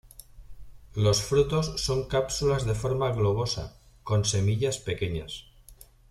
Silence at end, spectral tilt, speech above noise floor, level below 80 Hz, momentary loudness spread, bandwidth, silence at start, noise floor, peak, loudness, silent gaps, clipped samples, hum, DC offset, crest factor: 0.25 s; -5 dB/octave; 26 dB; -44 dBFS; 12 LU; 14 kHz; 0.2 s; -52 dBFS; -10 dBFS; -27 LUFS; none; under 0.1%; none; under 0.1%; 16 dB